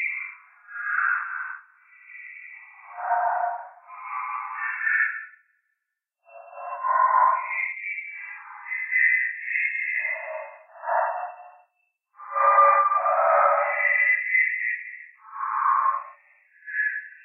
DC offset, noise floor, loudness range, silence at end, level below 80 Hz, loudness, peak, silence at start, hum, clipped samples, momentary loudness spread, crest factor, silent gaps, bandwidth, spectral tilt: under 0.1%; -82 dBFS; 9 LU; 0.1 s; under -90 dBFS; -23 LUFS; -6 dBFS; 0 s; none; under 0.1%; 22 LU; 18 dB; none; 3.6 kHz; -2.5 dB/octave